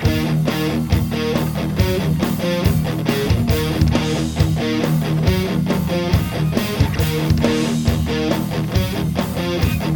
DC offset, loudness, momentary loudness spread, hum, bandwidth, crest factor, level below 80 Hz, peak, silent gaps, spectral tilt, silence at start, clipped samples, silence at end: under 0.1%; -19 LUFS; 3 LU; none; over 20 kHz; 18 dB; -28 dBFS; 0 dBFS; none; -6.5 dB/octave; 0 s; under 0.1%; 0 s